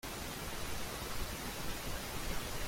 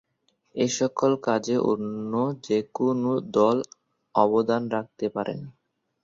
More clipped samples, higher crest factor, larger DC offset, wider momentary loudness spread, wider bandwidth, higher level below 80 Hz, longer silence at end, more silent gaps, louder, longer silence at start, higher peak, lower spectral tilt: neither; about the same, 16 dB vs 20 dB; neither; second, 1 LU vs 9 LU; first, 16.5 kHz vs 7.8 kHz; first, -46 dBFS vs -68 dBFS; second, 0 s vs 0.55 s; neither; second, -41 LUFS vs -25 LUFS; second, 0.05 s vs 0.55 s; second, -24 dBFS vs -4 dBFS; second, -3 dB/octave vs -5.5 dB/octave